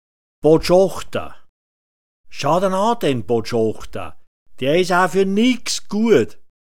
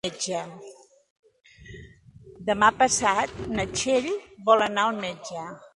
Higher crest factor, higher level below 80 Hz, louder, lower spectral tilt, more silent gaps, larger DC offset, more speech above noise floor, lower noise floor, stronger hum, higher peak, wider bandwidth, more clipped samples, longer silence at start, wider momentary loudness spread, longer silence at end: about the same, 18 dB vs 22 dB; first, -44 dBFS vs -54 dBFS; first, -18 LUFS vs -24 LUFS; first, -5 dB/octave vs -2.5 dB/octave; first, 1.49-2.24 s, 4.27-4.46 s vs 1.10-1.23 s; first, 4% vs under 0.1%; first, over 73 dB vs 25 dB; first, under -90 dBFS vs -50 dBFS; neither; about the same, -2 dBFS vs -4 dBFS; first, 17 kHz vs 11.5 kHz; neither; first, 0.4 s vs 0.05 s; second, 15 LU vs 20 LU; about the same, 0.15 s vs 0.1 s